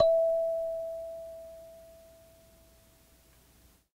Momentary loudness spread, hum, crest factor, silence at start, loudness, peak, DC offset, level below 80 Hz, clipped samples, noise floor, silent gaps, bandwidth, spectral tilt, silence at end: 26 LU; none; 22 dB; 0 s; -31 LUFS; -10 dBFS; under 0.1%; -62 dBFS; under 0.1%; -62 dBFS; none; 16 kHz; -4 dB/octave; 2.05 s